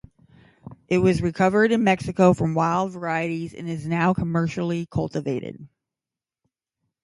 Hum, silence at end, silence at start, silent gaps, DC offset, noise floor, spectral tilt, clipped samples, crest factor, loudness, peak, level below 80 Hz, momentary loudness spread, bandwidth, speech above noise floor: none; 1.35 s; 0.65 s; none; under 0.1%; -90 dBFS; -7 dB/octave; under 0.1%; 18 dB; -22 LUFS; -4 dBFS; -50 dBFS; 11 LU; 11.5 kHz; 68 dB